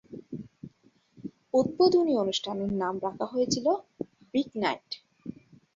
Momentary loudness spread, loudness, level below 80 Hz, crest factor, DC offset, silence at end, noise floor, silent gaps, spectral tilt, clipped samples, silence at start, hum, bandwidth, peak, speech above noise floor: 22 LU; -28 LUFS; -64 dBFS; 18 dB; under 0.1%; 0.45 s; -64 dBFS; none; -5 dB/octave; under 0.1%; 0.1 s; none; 7.8 kHz; -12 dBFS; 37 dB